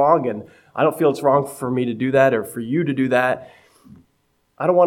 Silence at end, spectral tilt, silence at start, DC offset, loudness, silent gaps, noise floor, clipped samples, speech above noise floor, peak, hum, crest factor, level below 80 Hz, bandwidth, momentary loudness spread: 0 s; -7 dB/octave; 0 s; under 0.1%; -20 LUFS; none; -66 dBFS; under 0.1%; 47 dB; -2 dBFS; none; 18 dB; -64 dBFS; 17 kHz; 9 LU